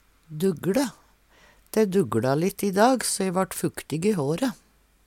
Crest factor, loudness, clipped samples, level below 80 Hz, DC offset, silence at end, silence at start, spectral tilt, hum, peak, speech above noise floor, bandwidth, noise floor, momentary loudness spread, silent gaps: 18 dB; -25 LUFS; under 0.1%; -60 dBFS; under 0.1%; 0.55 s; 0.3 s; -5 dB/octave; none; -8 dBFS; 33 dB; 17.5 kHz; -57 dBFS; 9 LU; none